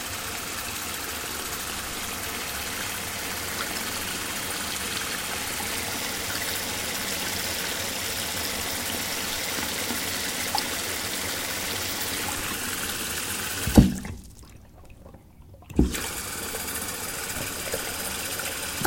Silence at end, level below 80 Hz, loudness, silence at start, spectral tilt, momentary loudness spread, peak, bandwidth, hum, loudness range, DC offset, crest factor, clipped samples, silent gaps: 0 s; -40 dBFS; -27 LUFS; 0 s; -2.5 dB/octave; 4 LU; 0 dBFS; 16.5 kHz; none; 4 LU; under 0.1%; 28 dB; under 0.1%; none